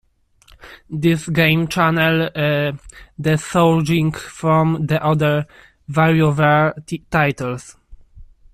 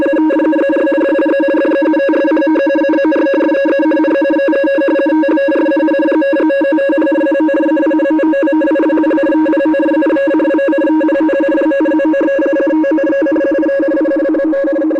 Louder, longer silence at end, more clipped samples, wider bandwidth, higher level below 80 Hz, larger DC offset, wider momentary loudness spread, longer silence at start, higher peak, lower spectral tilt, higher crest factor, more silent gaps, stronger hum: second, -17 LUFS vs -12 LUFS; first, 0.3 s vs 0 s; neither; first, 14.5 kHz vs 5.2 kHz; first, -46 dBFS vs -54 dBFS; neither; first, 10 LU vs 1 LU; first, 0.65 s vs 0 s; first, -2 dBFS vs -6 dBFS; about the same, -6.5 dB/octave vs -6 dB/octave; first, 16 dB vs 4 dB; neither; neither